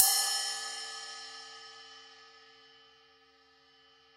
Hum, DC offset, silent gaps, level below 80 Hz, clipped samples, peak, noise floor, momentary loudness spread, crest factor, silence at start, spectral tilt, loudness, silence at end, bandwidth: none; under 0.1%; none; -84 dBFS; under 0.1%; -2 dBFS; -64 dBFS; 27 LU; 36 dB; 0 s; 4 dB/octave; -32 LUFS; 1.85 s; 16 kHz